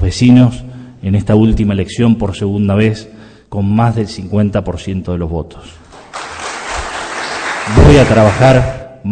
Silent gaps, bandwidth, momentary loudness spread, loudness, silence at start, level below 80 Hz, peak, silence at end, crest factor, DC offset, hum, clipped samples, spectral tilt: none; 9.4 kHz; 16 LU; -12 LUFS; 0 s; -26 dBFS; 0 dBFS; 0 s; 12 dB; under 0.1%; none; 0.6%; -7 dB/octave